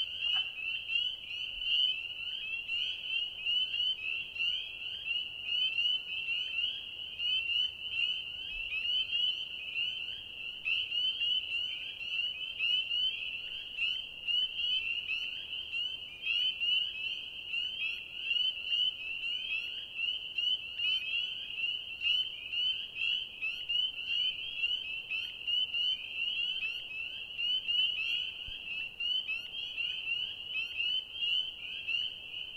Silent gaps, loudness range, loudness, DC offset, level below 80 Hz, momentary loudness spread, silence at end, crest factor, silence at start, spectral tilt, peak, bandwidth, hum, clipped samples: none; 1 LU; -32 LUFS; under 0.1%; -66 dBFS; 8 LU; 0 s; 16 dB; 0 s; 0 dB/octave; -20 dBFS; 16 kHz; none; under 0.1%